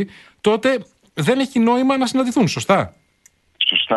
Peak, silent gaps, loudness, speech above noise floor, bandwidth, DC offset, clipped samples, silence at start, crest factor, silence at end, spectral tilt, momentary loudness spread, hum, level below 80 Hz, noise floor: -2 dBFS; none; -18 LUFS; 39 dB; 12 kHz; under 0.1%; under 0.1%; 0 s; 18 dB; 0 s; -4.5 dB/octave; 8 LU; none; -56 dBFS; -57 dBFS